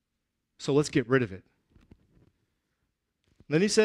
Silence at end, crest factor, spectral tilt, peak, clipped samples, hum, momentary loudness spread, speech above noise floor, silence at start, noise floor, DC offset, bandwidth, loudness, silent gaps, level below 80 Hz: 0 s; 20 dB; -5 dB/octave; -10 dBFS; under 0.1%; none; 12 LU; 57 dB; 0.6 s; -82 dBFS; under 0.1%; 13 kHz; -28 LUFS; none; -64 dBFS